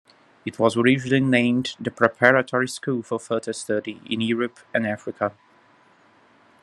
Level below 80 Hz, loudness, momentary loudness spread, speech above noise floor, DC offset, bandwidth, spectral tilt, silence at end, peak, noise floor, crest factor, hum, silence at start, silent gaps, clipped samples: -66 dBFS; -22 LUFS; 11 LU; 34 dB; under 0.1%; 12 kHz; -5.5 dB/octave; 1.3 s; 0 dBFS; -56 dBFS; 22 dB; none; 0.45 s; none; under 0.1%